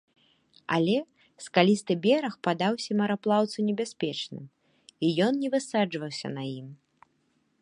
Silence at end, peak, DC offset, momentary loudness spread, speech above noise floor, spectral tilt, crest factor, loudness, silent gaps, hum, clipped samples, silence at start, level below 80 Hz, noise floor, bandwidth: 0.85 s; -4 dBFS; under 0.1%; 14 LU; 44 dB; -5.5 dB/octave; 24 dB; -27 LUFS; none; none; under 0.1%; 0.7 s; -74 dBFS; -71 dBFS; 11.5 kHz